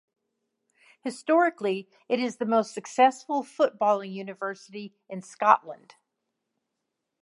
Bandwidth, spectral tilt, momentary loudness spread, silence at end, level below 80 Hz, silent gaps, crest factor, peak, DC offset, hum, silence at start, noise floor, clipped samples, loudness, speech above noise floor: 11.5 kHz; -4.5 dB/octave; 18 LU; 1.45 s; -86 dBFS; none; 26 dB; -2 dBFS; under 0.1%; none; 1.05 s; -83 dBFS; under 0.1%; -26 LUFS; 56 dB